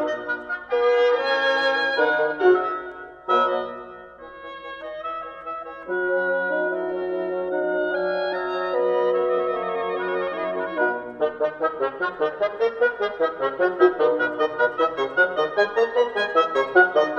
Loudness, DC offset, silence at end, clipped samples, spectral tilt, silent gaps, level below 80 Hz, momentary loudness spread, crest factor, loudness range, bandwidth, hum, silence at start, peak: -22 LUFS; under 0.1%; 0 s; under 0.1%; -5 dB/octave; none; -62 dBFS; 14 LU; 18 dB; 6 LU; 7 kHz; none; 0 s; -4 dBFS